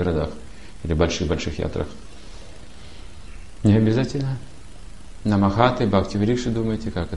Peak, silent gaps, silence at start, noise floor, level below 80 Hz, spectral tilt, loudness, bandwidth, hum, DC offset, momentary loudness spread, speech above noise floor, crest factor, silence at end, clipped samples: -2 dBFS; none; 0 s; -42 dBFS; -36 dBFS; -7 dB/octave; -22 LUFS; 11.5 kHz; none; 2%; 25 LU; 21 dB; 22 dB; 0 s; under 0.1%